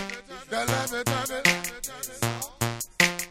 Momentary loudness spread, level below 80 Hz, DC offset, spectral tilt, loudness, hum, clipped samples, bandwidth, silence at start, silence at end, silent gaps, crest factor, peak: 11 LU; -52 dBFS; under 0.1%; -3 dB/octave; -27 LUFS; none; under 0.1%; 17 kHz; 0 s; 0 s; none; 22 dB; -6 dBFS